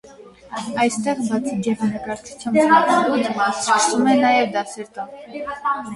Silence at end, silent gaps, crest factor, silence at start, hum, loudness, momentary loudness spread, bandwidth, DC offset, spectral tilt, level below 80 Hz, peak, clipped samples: 0 s; none; 18 dB; 0.05 s; none; -19 LUFS; 17 LU; 11.5 kHz; under 0.1%; -4 dB/octave; -60 dBFS; -2 dBFS; under 0.1%